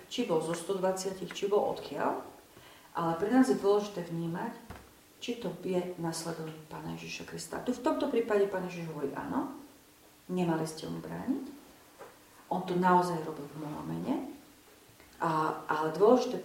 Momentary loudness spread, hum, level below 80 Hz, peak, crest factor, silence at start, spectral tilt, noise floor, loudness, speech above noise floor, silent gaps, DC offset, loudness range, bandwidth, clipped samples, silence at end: 16 LU; none; -68 dBFS; -10 dBFS; 24 dB; 0 s; -5.5 dB/octave; -59 dBFS; -32 LUFS; 28 dB; none; under 0.1%; 6 LU; 16.5 kHz; under 0.1%; 0 s